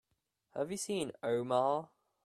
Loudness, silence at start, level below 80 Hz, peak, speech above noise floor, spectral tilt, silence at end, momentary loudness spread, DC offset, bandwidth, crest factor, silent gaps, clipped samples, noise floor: -36 LUFS; 0.55 s; -76 dBFS; -18 dBFS; 47 dB; -4.5 dB/octave; 0.4 s; 8 LU; under 0.1%; 15 kHz; 18 dB; none; under 0.1%; -82 dBFS